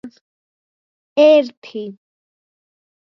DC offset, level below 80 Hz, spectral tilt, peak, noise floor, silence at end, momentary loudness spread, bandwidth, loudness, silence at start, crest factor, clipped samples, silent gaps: under 0.1%; -78 dBFS; -5 dB/octave; -2 dBFS; under -90 dBFS; 1.25 s; 19 LU; 6.2 kHz; -13 LUFS; 0.05 s; 18 dB; under 0.1%; 0.21-1.16 s, 1.57-1.62 s